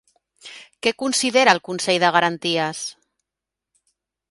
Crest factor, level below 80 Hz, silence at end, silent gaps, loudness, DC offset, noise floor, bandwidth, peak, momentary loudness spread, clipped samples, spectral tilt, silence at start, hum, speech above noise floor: 22 dB; -68 dBFS; 1.4 s; none; -19 LUFS; under 0.1%; -86 dBFS; 11.5 kHz; 0 dBFS; 19 LU; under 0.1%; -2.5 dB/octave; 0.45 s; none; 66 dB